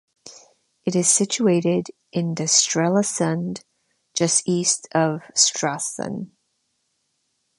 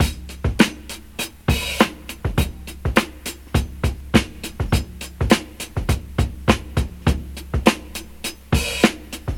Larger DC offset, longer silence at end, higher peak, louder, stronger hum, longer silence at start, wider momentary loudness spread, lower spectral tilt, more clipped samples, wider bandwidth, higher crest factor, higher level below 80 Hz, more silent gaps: neither; first, 1.3 s vs 0 s; second, -4 dBFS vs 0 dBFS; about the same, -20 LUFS vs -22 LUFS; neither; first, 0.25 s vs 0 s; about the same, 13 LU vs 11 LU; second, -3.5 dB/octave vs -5 dB/octave; neither; second, 11.5 kHz vs 18.5 kHz; about the same, 20 dB vs 22 dB; second, -68 dBFS vs -28 dBFS; neither